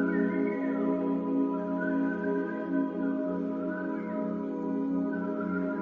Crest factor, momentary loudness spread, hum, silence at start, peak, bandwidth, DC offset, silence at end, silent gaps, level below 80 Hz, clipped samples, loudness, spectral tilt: 14 dB; 4 LU; none; 0 s; -16 dBFS; 3.7 kHz; under 0.1%; 0 s; none; -72 dBFS; under 0.1%; -31 LUFS; -10 dB/octave